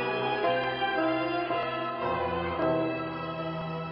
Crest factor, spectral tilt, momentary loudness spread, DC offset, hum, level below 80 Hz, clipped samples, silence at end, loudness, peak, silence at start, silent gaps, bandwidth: 14 dB; -8.5 dB/octave; 7 LU; under 0.1%; none; -58 dBFS; under 0.1%; 0 s; -30 LUFS; -16 dBFS; 0 s; none; 5.6 kHz